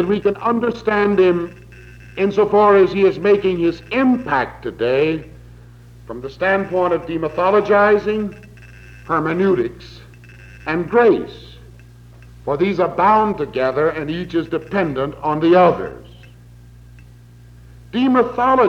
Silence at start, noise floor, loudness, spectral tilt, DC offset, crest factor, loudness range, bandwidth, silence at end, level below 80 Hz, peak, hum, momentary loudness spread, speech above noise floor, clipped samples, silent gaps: 0 s; -43 dBFS; -17 LUFS; -7.5 dB/octave; under 0.1%; 16 dB; 4 LU; 7 kHz; 0 s; -46 dBFS; -2 dBFS; none; 13 LU; 26 dB; under 0.1%; none